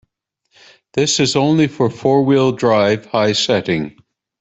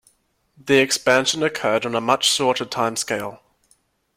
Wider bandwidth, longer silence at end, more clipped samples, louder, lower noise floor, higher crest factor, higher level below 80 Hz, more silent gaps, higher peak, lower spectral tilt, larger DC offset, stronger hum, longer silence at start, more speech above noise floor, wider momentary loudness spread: second, 8.4 kHz vs 16.5 kHz; second, 0.5 s vs 0.8 s; neither; first, -15 LUFS vs -19 LUFS; first, -69 dBFS vs -63 dBFS; second, 14 dB vs 20 dB; first, -54 dBFS vs -62 dBFS; neither; about the same, -2 dBFS vs -2 dBFS; first, -4.5 dB/octave vs -2.5 dB/octave; neither; neither; first, 0.95 s vs 0.65 s; first, 54 dB vs 43 dB; about the same, 7 LU vs 9 LU